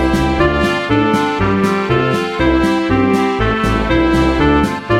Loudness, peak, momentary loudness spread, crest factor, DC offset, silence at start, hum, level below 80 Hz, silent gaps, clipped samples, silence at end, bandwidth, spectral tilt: -14 LUFS; 0 dBFS; 2 LU; 12 dB; 0.1%; 0 s; none; -26 dBFS; none; under 0.1%; 0 s; 15 kHz; -6.5 dB/octave